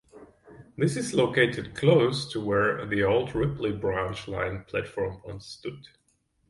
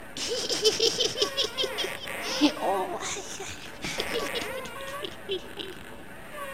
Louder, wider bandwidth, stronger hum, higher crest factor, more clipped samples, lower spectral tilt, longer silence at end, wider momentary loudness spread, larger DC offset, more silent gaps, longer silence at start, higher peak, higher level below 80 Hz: first, -26 LUFS vs -29 LUFS; second, 11.5 kHz vs 17 kHz; neither; about the same, 20 dB vs 24 dB; neither; first, -6 dB/octave vs -2 dB/octave; first, 0.7 s vs 0 s; about the same, 16 LU vs 15 LU; second, under 0.1% vs 0.5%; neither; first, 0.15 s vs 0 s; about the same, -8 dBFS vs -6 dBFS; about the same, -52 dBFS vs -56 dBFS